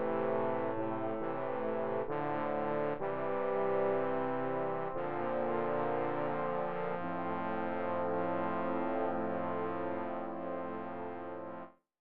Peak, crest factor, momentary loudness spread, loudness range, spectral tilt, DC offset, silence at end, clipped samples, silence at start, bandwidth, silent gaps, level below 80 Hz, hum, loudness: -22 dBFS; 14 dB; 6 LU; 2 LU; -6 dB/octave; 0.6%; 0 s; under 0.1%; 0 s; 5 kHz; none; -70 dBFS; none; -36 LUFS